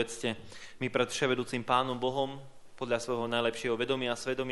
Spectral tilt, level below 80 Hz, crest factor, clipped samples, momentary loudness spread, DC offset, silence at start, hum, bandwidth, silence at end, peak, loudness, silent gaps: -4 dB/octave; -64 dBFS; 22 dB; under 0.1%; 9 LU; under 0.1%; 0 s; none; 11.5 kHz; 0 s; -10 dBFS; -32 LUFS; none